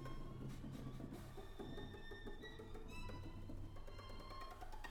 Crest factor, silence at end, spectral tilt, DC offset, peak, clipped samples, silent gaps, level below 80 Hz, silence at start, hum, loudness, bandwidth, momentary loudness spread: 14 dB; 0 s; -6 dB/octave; under 0.1%; -36 dBFS; under 0.1%; none; -54 dBFS; 0 s; none; -54 LUFS; 16.5 kHz; 4 LU